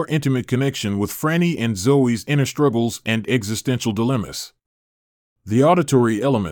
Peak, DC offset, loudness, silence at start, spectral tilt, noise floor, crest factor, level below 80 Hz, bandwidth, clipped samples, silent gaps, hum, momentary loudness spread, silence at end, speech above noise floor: -4 dBFS; under 0.1%; -19 LUFS; 0 s; -6 dB/octave; under -90 dBFS; 16 dB; -56 dBFS; 19.5 kHz; under 0.1%; 4.66-5.36 s; none; 7 LU; 0 s; over 71 dB